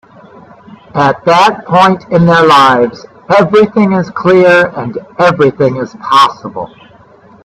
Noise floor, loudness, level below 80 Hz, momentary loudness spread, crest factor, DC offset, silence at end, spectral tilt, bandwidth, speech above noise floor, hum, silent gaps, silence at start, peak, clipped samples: -40 dBFS; -8 LUFS; -48 dBFS; 15 LU; 10 dB; under 0.1%; 0.8 s; -6 dB/octave; 13.5 kHz; 31 dB; none; none; 0.95 s; 0 dBFS; 0.1%